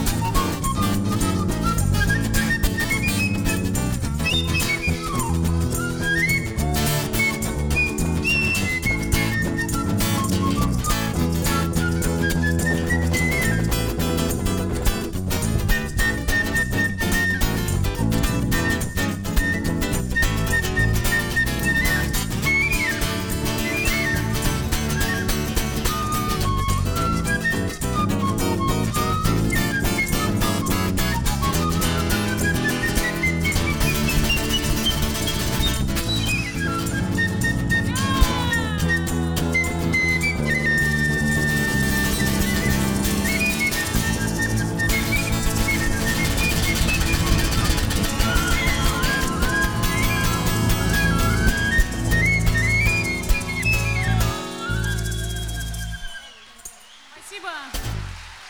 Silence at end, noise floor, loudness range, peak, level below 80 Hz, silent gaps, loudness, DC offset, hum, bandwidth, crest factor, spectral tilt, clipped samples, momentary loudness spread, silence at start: 0 s; -45 dBFS; 2 LU; -2 dBFS; -28 dBFS; none; -21 LUFS; 0.2%; none; over 20 kHz; 18 dB; -4 dB/octave; under 0.1%; 4 LU; 0 s